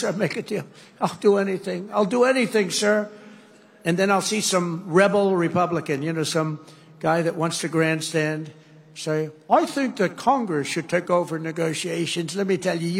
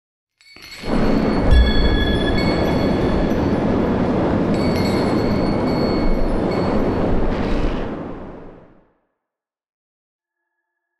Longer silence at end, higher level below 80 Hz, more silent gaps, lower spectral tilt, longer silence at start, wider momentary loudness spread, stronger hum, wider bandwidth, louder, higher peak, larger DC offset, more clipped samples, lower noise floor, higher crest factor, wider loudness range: second, 0 s vs 2.35 s; second, -70 dBFS vs -24 dBFS; neither; second, -4.5 dB/octave vs -7.5 dB/octave; second, 0 s vs 0.5 s; about the same, 9 LU vs 9 LU; neither; first, 16 kHz vs 12.5 kHz; second, -23 LUFS vs -19 LUFS; about the same, -4 dBFS vs -4 dBFS; second, under 0.1% vs 0.6%; neither; second, -50 dBFS vs -85 dBFS; about the same, 20 dB vs 16 dB; second, 3 LU vs 10 LU